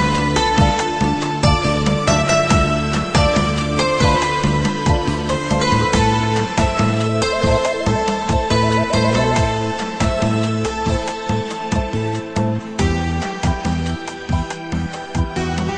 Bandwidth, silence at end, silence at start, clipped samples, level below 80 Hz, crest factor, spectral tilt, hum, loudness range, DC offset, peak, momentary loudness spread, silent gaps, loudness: 10.5 kHz; 0 s; 0 s; under 0.1%; -28 dBFS; 16 dB; -5 dB/octave; none; 5 LU; under 0.1%; -2 dBFS; 7 LU; none; -18 LUFS